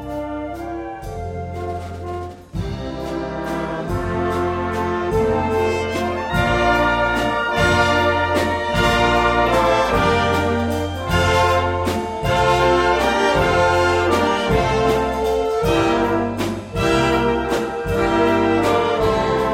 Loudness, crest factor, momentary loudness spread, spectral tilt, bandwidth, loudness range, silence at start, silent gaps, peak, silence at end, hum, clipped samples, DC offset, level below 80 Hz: -18 LUFS; 16 dB; 12 LU; -5.5 dB/octave; 16.5 kHz; 8 LU; 0 s; none; -4 dBFS; 0 s; none; under 0.1%; under 0.1%; -34 dBFS